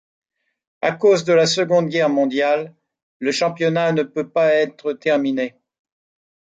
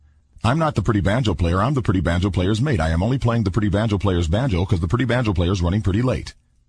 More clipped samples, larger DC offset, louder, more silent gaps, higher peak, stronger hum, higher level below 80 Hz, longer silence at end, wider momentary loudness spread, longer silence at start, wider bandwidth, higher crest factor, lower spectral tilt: neither; neither; about the same, -19 LUFS vs -20 LUFS; first, 3.02-3.20 s vs none; about the same, -4 dBFS vs -4 dBFS; neither; second, -68 dBFS vs -32 dBFS; first, 0.95 s vs 0.35 s; first, 8 LU vs 2 LU; first, 0.85 s vs 0.45 s; second, 9.2 kHz vs 10.5 kHz; about the same, 16 dB vs 16 dB; second, -5 dB/octave vs -7 dB/octave